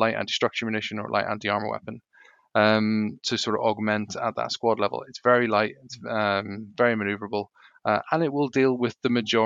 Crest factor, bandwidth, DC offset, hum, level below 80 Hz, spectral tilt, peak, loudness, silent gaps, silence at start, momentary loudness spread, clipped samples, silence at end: 20 dB; 7.8 kHz; under 0.1%; none; -74 dBFS; -5 dB/octave; -4 dBFS; -25 LUFS; none; 0 s; 11 LU; under 0.1%; 0 s